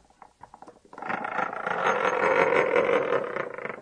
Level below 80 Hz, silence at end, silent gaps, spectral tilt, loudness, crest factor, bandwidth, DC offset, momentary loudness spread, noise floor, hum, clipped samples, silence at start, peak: -68 dBFS; 0 s; none; -4.5 dB/octave; -25 LUFS; 20 dB; 9.6 kHz; under 0.1%; 11 LU; -52 dBFS; none; under 0.1%; 0.65 s; -6 dBFS